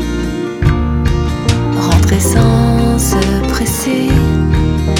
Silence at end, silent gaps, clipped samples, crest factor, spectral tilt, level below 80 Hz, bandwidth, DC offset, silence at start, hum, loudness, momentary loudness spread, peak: 0 s; none; under 0.1%; 12 dB; -5.5 dB/octave; -18 dBFS; 19.5 kHz; under 0.1%; 0 s; none; -13 LUFS; 5 LU; 0 dBFS